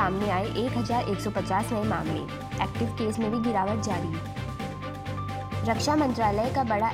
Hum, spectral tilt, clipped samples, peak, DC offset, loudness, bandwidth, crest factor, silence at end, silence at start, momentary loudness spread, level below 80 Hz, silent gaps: none; -6 dB/octave; under 0.1%; -10 dBFS; under 0.1%; -28 LUFS; 16 kHz; 18 dB; 0 s; 0 s; 9 LU; -46 dBFS; none